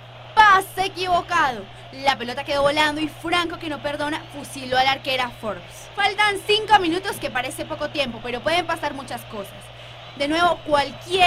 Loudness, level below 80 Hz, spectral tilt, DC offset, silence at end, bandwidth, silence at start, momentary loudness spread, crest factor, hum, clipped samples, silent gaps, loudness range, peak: -21 LUFS; -48 dBFS; -3.5 dB/octave; under 0.1%; 0 s; 16 kHz; 0 s; 17 LU; 20 dB; none; under 0.1%; none; 5 LU; -4 dBFS